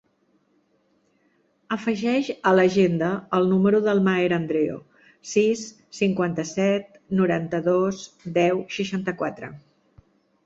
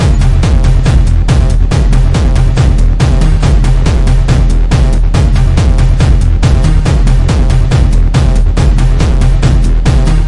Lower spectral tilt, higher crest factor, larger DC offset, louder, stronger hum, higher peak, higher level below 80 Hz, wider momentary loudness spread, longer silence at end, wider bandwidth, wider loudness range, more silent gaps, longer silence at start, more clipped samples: about the same, -6 dB/octave vs -6.5 dB/octave; first, 18 dB vs 6 dB; neither; second, -23 LUFS vs -10 LUFS; neither; second, -6 dBFS vs 0 dBFS; second, -64 dBFS vs -8 dBFS; first, 11 LU vs 1 LU; first, 0.85 s vs 0 s; second, 7.8 kHz vs 11 kHz; first, 4 LU vs 0 LU; neither; first, 1.7 s vs 0 s; second, under 0.1% vs 0.1%